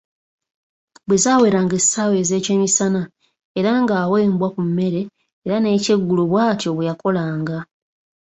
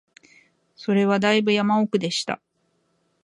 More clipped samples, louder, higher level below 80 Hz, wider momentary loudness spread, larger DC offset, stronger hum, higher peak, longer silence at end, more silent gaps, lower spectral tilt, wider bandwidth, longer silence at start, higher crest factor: neither; first, -18 LUFS vs -21 LUFS; first, -58 dBFS vs -70 dBFS; about the same, 11 LU vs 12 LU; neither; neither; about the same, -4 dBFS vs -6 dBFS; second, 0.65 s vs 0.9 s; first, 3.45-3.55 s, 5.33-5.42 s vs none; about the same, -4.5 dB/octave vs -5 dB/octave; second, 8.2 kHz vs 11 kHz; first, 1.1 s vs 0.8 s; about the same, 16 dB vs 18 dB